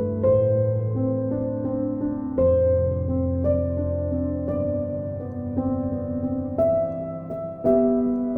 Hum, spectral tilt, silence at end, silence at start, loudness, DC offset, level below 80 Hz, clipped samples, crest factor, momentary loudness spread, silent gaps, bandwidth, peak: none; -13.5 dB/octave; 0 s; 0 s; -24 LUFS; under 0.1%; -42 dBFS; under 0.1%; 14 dB; 9 LU; none; 2.8 kHz; -8 dBFS